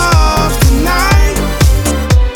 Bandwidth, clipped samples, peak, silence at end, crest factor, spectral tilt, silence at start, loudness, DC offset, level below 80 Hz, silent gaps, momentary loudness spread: 19.5 kHz; under 0.1%; 0 dBFS; 0 s; 10 dB; -5 dB/octave; 0 s; -11 LUFS; under 0.1%; -12 dBFS; none; 2 LU